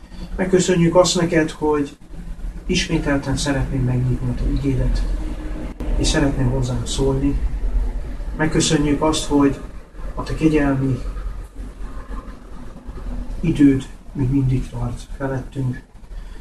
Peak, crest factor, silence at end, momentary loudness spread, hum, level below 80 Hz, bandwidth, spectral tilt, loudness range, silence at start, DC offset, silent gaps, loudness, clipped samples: -2 dBFS; 18 dB; 0 s; 20 LU; none; -26 dBFS; 12.5 kHz; -5.5 dB/octave; 4 LU; 0 s; 0.3%; none; -20 LUFS; under 0.1%